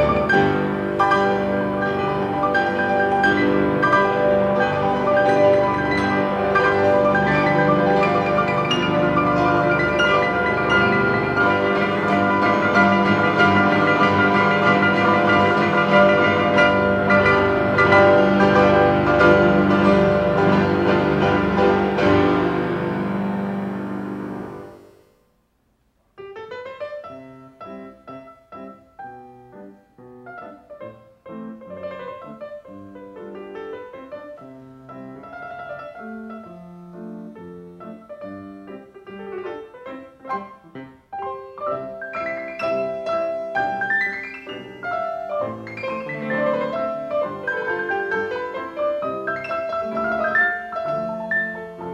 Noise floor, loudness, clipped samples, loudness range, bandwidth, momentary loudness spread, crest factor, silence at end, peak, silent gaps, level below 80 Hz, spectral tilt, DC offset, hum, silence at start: -65 dBFS; -18 LUFS; under 0.1%; 22 LU; 9.6 kHz; 22 LU; 18 dB; 0 s; -2 dBFS; none; -46 dBFS; -7 dB/octave; under 0.1%; none; 0 s